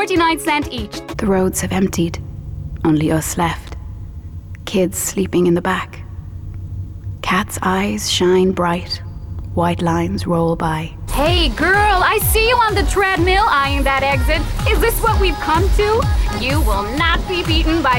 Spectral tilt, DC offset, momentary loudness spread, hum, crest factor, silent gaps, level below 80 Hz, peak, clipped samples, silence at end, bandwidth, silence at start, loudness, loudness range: -4.5 dB/octave; under 0.1%; 16 LU; none; 12 dB; none; -24 dBFS; -6 dBFS; under 0.1%; 0 s; 17.5 kHz; 0 s; -16 LUFS; 6 LU